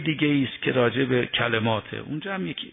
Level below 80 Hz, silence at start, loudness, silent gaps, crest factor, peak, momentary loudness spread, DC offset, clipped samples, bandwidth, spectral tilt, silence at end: -58 dBFS; 0 s; -24 LUFS; none; 18 dB; -8 dBFS; 8 LU; under 0.1%; under 0.1%; 3.9 kHz; -9.5 dB/octave; 0 s